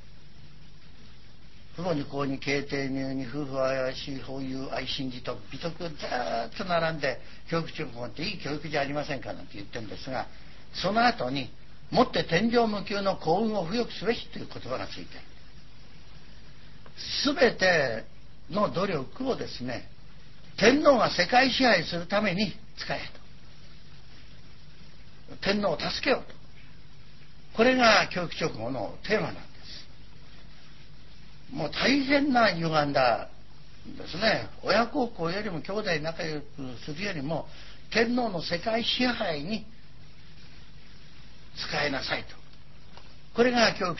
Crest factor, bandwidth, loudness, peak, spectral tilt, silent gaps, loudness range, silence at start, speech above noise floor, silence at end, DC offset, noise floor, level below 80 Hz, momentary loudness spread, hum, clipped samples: 24 dB; 6.2 kHz; -27 LUFS; -6 dBFS; -4.5 dB/octave; none; 9 LU; 0 s; 25 dB; 0 s; 1%; -52 dBFS; -54 dBFS; 17 LU; none; under 0.1%